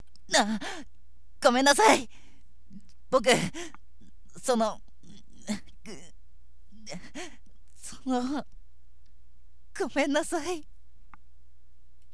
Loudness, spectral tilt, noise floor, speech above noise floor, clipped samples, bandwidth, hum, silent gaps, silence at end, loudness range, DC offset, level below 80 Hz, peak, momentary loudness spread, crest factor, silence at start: -27 LUFS; -3 dB/octave; -61 dBFS; 35 dB; under 0.1%; 11 kHz; none; none; 1.5 s; 12 LU; 1%; -54 dBFS; -6 dBFS; 24 LU; 24 dB; 0.3 s